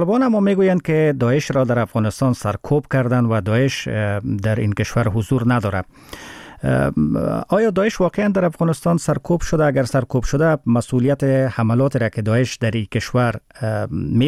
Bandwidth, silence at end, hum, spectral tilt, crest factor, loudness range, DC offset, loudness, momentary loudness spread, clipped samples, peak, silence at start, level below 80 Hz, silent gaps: 14 kHz; 0 s; none; -7 dB/octave; 10 dB; 2 LU; under 0.1%; -19 LUFS; 6 LU; under 0.1%; -8 dBFS; 0 s; -40 dBFS; none